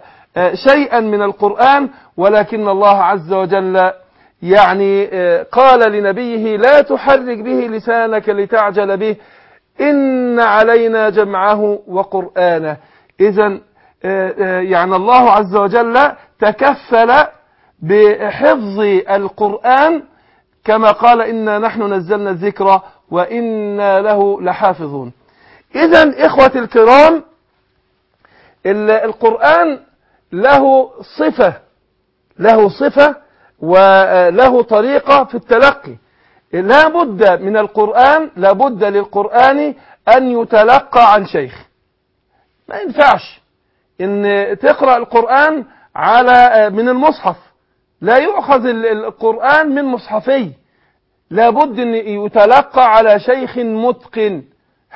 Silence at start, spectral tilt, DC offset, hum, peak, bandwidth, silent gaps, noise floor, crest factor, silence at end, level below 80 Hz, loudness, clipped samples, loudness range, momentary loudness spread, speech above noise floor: 0.35 s; -6.5 dB/octave; under 0.1%; none; 0 dBFS; 8 kHz; none; -64 dBFS; 12 dB; 0.55 s; -50 dBFS; -11 LUFS; 0.4%; 4 LU; 10 LU; 53 dB